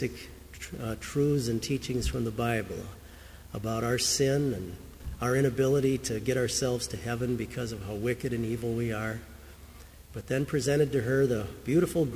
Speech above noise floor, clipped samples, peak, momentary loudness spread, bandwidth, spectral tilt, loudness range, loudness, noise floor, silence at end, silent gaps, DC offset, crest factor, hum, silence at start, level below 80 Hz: 20 dB; under 0.1%; -12 dBFS; 18 LU; 16 kHz; -5 dB/octave; 5 LU; -29 LUFS; -49 dBFS; 0 s; none; under 0.1%; 16 dB; none; 0 s; -46 dBFS